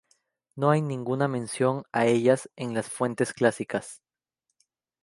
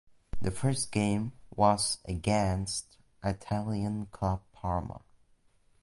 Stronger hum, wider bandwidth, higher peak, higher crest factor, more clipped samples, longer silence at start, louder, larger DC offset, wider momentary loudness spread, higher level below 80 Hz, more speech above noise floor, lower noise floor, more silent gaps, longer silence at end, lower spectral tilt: neither; about the same, 11.5 kHz vs 11.5 kHz; first, -6 dBFS vs -12 dBFS; about the same, 20 dB vs 20 dB; neither; first, 0.55 s vs 0.35 s; first, -26 LUFS vs -31 LUFS; neither; about the same, 9 LU vs 10 LU; second, -70 dBFS vs -48 dBFS; first, 57 dB vs 35 dB; first, -82 dBFS vs -65 dBFS; neither; first, 1.05 s vs 0.85 s; about the same, -6 dB/octave vs -5 dB/octave